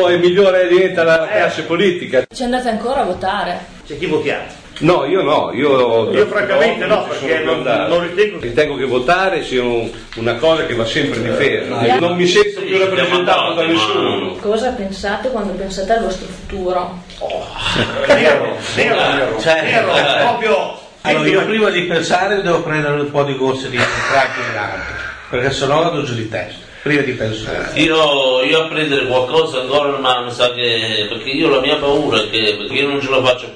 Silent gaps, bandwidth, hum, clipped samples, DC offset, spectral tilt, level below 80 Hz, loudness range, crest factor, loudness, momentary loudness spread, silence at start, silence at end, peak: none; 10.5 kHz; none; under 0.1%; under 0.1%; -4.5 dB/octave; -42 dBFS; 4 LU; 16 dB; -15 LUFS; 9 LU; 0 s; 0 s; 0 dBFS